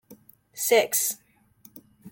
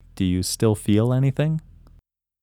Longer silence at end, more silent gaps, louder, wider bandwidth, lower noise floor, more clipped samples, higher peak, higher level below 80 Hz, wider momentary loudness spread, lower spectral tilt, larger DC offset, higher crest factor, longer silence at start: second, 0 s vs 0.85 s; neither; about the same, -23 LUFS vs -22 LUFS; about the same, 17 kHz vs 17 kHz; about the same, -57 dBFS vs -57 dBFS; neither; about the same, -8 dBFS vs -6 dBFS; second, -76 dBFS vs -48 dBFS; first, 19 LU vs 5 LU; second, -0.5 dB/octave vs -6.5 dB/octave; neither; about the same, 20 dB vs 16 dB; about the same, 0.1 s vs 0.15 s